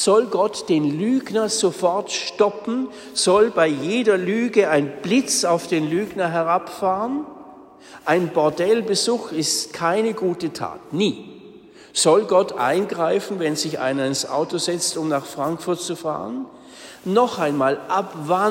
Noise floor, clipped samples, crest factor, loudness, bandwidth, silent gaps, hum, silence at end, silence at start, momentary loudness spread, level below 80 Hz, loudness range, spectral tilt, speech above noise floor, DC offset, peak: -44 dBFS; under 0.1%; 16 dB; -21 LUFS; 16 kHz; none; none; 0 s; 0 s; 9 LU; -64 dBFS; 4 LU; -4 dB/octave; 24 dB; under 0.1%; -4 dBFS